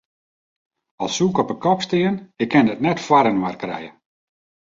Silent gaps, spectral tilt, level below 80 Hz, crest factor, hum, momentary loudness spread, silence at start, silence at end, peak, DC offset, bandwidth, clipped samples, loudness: none; -5.5 dB/octave; -60 dBFS; 20 dB; none; 13 LU; 1 s; 0.8 s; -2 dBFS; under 0.1%; 7.8 kHz; under 0.1%; -20 LUFS